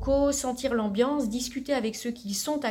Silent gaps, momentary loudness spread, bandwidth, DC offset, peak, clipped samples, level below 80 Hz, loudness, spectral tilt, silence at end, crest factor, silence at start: none; 7 LU; 19 kHz; under 0.1%; -12 dBFS; under 0.1%; -44 dBFS; -28 LUFS; -4 dB/octave; 0 s; 16 dB; 0 s